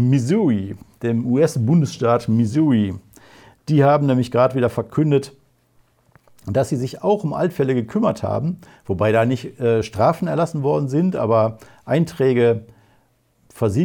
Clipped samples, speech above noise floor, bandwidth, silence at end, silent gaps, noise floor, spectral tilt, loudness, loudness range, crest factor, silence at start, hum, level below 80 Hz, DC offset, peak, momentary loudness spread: under 0.1%; 42 dB; 16.5 kHz; 0 s; none; -60 dBFS; -8 dB/octave; -19 LUFS; 4 LU; 16 dB; 0 s; none; -56 dBFS; under 0.1%; -4 dBFS; 8 LU